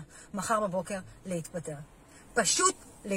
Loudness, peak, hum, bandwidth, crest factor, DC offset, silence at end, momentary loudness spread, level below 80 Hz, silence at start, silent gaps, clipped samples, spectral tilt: -30 LUFS; -10 dBFS; none; 16.5 kHz; 22 dB; under 0.1%; 0 s; 17 LU; -60 dBFS; 0 s; none; under 0.1%; -2.5 dB/octave